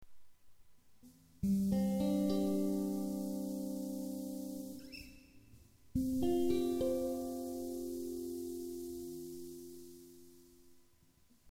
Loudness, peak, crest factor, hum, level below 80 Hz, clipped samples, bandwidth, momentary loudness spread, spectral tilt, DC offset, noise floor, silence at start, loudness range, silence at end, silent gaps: -38 LUFS; -24 dBFS; 16 dB; none; -60 dBFS; under 0.1%; 16.5 kHz; 17 LU; -7 dB/octave; under 0.1%; -68 dBFS; 0 s; 9 LU; 0 s; none